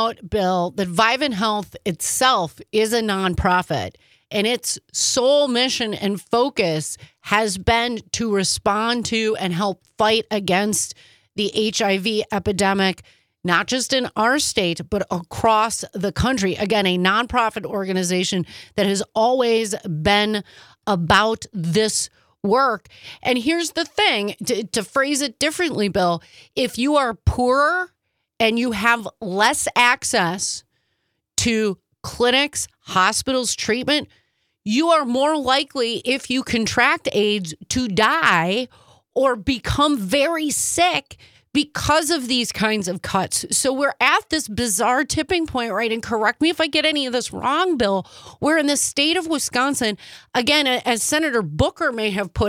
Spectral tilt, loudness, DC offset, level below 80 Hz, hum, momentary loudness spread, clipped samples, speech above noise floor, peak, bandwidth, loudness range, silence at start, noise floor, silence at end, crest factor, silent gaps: -3 dB/octave; -20 LUFS; under 0.1%; -44 dBFS; none; 8 LU; under 0.1%; 52 dB; -2 dBFS; 17.5 kHz; 2 LU; 0 s; -72 dBFS; 0 s; 20 dB; none